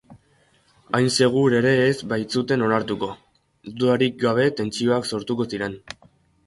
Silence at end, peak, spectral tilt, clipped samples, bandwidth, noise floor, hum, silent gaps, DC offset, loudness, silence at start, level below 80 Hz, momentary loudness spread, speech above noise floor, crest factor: 0.55 s; -4 dBFS; -5.5 dB/octave; under 0.1%; 11.5 kHz; -61 dBFS; none; none; under 0.1%; -21 LUFS; 0.1 s; -58 dBFS; 13 LU; 40 dB; 18 dB